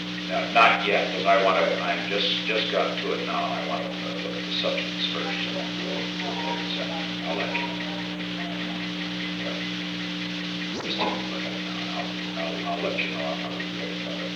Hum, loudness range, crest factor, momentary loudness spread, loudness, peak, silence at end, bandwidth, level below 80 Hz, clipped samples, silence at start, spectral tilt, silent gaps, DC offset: 60 Hz at -40 dBFS; 7 LU; 22 dB; 8 LU; -26 LUFS; -6 dBFS; 0 s; 11 kHz; -60 dBFS; under 0.1%; 0 s; -4.5 dB/octave; none; under 0.1%